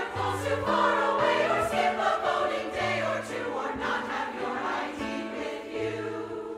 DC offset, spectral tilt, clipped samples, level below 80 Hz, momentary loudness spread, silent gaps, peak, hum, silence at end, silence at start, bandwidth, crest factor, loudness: under 0.1%; -4.5 dB/octave; under 0.1%; -58 dBFS; 9 LU; none; -12 dBFS; none; 0 s; 0 s; 15.5 kHz; 16 dB; -28 LUFS